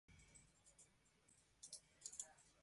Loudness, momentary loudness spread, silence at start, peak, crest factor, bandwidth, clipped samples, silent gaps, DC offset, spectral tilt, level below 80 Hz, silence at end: -58 LUFS; 15 LU; 0.1 s; -34 dBFS; 30 dB; 11.5 kHz; under 0.1%; none; under 0.1%; -0.5 dB/octave; -82 dBFS; 0 s